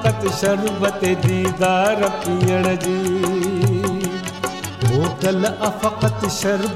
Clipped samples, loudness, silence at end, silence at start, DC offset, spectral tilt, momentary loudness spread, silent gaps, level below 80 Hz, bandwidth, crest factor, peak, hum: under 0.1%; -19 LUFS; 0 s; 0 s; under 0.1%; -5.5 dB/octave; 5 LU; none; -44 dBFS; 16 kHz; 14 dB; -4 dBFS; none